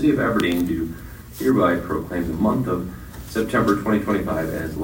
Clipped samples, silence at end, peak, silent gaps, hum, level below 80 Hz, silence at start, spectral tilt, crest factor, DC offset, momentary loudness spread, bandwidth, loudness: under 0.1%; 0 s; -4 dBFS; none; none; -40 dBFS; 0 s; -6.5 dB/octave; 16 dB; under 0.1%; 11 LU; 16.5 kHz; -22 LUFS